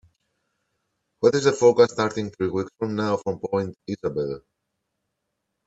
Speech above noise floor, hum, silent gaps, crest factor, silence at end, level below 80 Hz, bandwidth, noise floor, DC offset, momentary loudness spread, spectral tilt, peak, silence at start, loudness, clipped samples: 57 dB; none; none; 20 dB; 1.3 s; -62 dBFS; 8 kHz; -79 dBFS; under 0.1%; 12 LU; -5.5 dB/octave; -4 dBFS; 1.2 s; -23 LUFS; under 0.1%